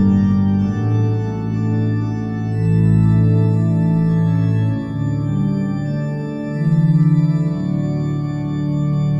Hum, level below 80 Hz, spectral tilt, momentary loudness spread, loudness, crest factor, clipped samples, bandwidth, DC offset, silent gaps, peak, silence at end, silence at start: none; -40 dBFS; -10 dB/octave; 8 LU; -18 LUFS; 12 dB; under 0.1%; 7.4 kHz; under 0.1%; none; -4 dBFS; 0 s; 0 s